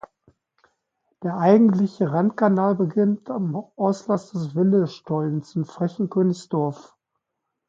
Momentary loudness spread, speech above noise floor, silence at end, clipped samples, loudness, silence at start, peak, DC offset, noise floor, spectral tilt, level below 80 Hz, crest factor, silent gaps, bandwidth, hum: 11 LU; 60 dB; 0.85 s; under 0.1%; -22 LUFS; 1.2 s; -4 dBFS; under 0.1%; -81 dBFS; -8.5 dB/octave; -70 dBFS; 18 dB; none; 7.6 kHz; none